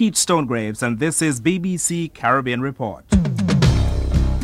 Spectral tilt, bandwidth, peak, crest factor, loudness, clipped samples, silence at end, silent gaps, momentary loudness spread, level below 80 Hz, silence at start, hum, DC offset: -5 dB/octave; 15.5 kHz; -2 dBFS; 16 dB; -19 LUFS; under 0.1%; 0 s; none; 7 LU; -26 dBFS; 0 s; none; under 0.1%